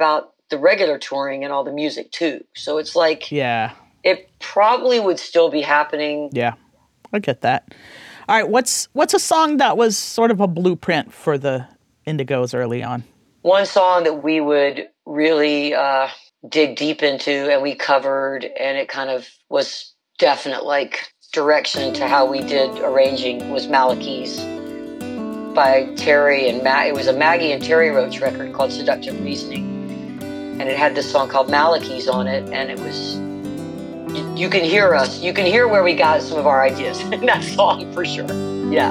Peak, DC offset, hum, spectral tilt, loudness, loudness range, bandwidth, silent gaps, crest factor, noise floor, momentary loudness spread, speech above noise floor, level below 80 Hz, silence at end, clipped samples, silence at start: -2 dBFS; under 0.1%; none; -4 dB/octave; -18 LUFS; 5 LU; 15.5 kHz; none; 16 dB; -51 dBFS; 12 LU; 33 dB; -62 dBFS; 0 s; under 0.1%; 0 s